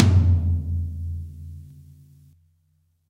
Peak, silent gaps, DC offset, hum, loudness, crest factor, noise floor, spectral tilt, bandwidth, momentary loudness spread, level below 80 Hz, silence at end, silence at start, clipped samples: -2 dBFS; none; under 0.1%; none; -23 LUFS; 22 dB; -66 dBFS; -8 dB/octave; 6.8 kHz; 23 LU; -34 dBFS; 1.45 s; 0 s; under 0.1%